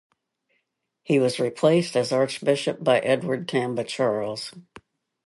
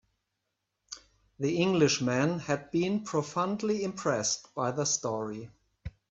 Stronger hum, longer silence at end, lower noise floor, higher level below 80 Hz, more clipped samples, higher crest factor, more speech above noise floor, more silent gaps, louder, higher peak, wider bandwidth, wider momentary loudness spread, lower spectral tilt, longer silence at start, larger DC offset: neither; first, 0.7 s vs 0.2 s; second, -76 dBFS vs -83 dBFS; second, -70 dBFS vs -62 dBFS; neither; about the same, 20 dB vs 20 dB; about the same, 52 dB vs 54 dB; neither; first, -23 LUFS vs -30 LUFS; first, -6 dBFS vs -12 dBFS; first, 11.5 kHz vs 8.4 kHz; second, 7 LU vs 20 LU; about the same, -5.5 dB/octave vs -4.5 dB/octave; first, 1.1 s vs 0.9 s; neither